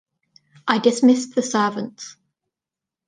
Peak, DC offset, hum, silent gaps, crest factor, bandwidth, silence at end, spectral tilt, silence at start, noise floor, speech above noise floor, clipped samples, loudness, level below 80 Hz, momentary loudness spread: -2 dBFS; under 0.1%; none; none; 20 dB; 9.8 kHz; 0.95 s; -4 dB/octave; 0.65 s; -88 dBFS; 69 dB; under 0.1%; -19 LUFS; -72 dBFS; 18 LU